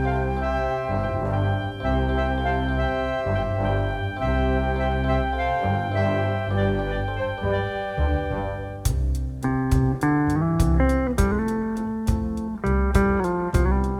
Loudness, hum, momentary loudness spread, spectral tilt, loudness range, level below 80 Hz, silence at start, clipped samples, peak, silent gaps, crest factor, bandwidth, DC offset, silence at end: -24 LUFS; none; 6 LU; -7.5 dB/octave; 2 LU; -28 dBFS; 0 s; under 0.1%; -4 dBFS; none; 18 dB; 14 kHz; under 0.1%; 0 s